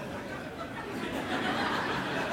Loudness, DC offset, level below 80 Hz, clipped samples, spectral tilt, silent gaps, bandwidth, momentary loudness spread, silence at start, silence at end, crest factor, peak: -33 LUFS; under 0.1%; -56 dBFS; under 0.1%; -4.5 dB/octave; none; 17 kHz; 9 LU; 0 s; 0 s; 14 dB; -18 dBFS